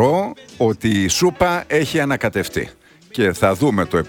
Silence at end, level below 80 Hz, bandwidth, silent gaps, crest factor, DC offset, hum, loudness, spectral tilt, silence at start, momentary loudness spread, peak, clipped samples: 0 s; -44 dBFS; 18 kHz; none; 16 dB; under 0.1%; none; -18 LUFS; -5 dB/octave; 0 s; 9 LU; -2 dBFS; under 0.1%